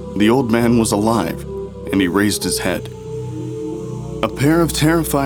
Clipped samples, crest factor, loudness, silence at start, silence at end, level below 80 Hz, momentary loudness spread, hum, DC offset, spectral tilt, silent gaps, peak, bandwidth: under 0.1%; 16 dB; -18 LUFS; 0 s; 0 s; -36 dBFS; 13 LU; none; under 0.1%; -5 dB/octave; none; 0 dBFS; over 20 kHz